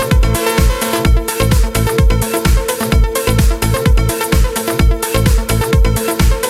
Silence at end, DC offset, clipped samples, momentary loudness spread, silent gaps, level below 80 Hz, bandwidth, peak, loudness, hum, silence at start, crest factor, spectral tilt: 0 s; under 0.1%; under 0.1%; 1 LU; none; -14 dBFS; 16.5 kHz; 0 dBFS; -14 LUFS; none; 0 s; 12 dB; -5 dB/octave